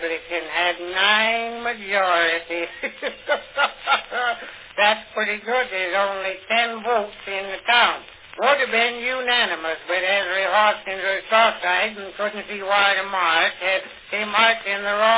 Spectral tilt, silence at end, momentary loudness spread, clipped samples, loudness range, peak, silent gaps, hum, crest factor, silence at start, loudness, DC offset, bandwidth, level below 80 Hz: -5 dB/octave; 0 s; 10 LU; under 0.1%; 3 LU; -2 dBFS; none; none; 20 dB; 0 s; -20 LUFS; under 0.1%; 4 kHz; -60 dBFS